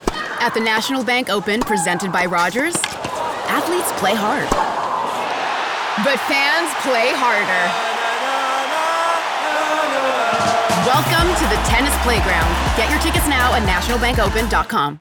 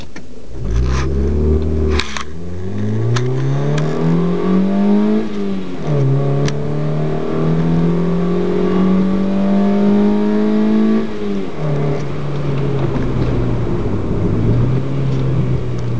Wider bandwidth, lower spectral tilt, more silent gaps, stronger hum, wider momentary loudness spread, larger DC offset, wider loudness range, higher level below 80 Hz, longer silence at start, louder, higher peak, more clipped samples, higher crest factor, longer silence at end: first, over 20 kHz vs 8 kHz; second, -3.5 dB/octave vs -8 dB/octave; neither; neither; second, 5 LU vs 8 LU; second, under 0.1% vs 9%; about the same, 3 LU vs 4 LU; about the same, -30 dBFS vs -26 dBFS; about the same, 0 s vs 0 s; about the same, -17 LUFS vs -17 LUFS; about the same, -2 dBFS vs 0 dBFS; neither; about the same, 14 dB vs 16 dB; about the same, 0 s vs 0 s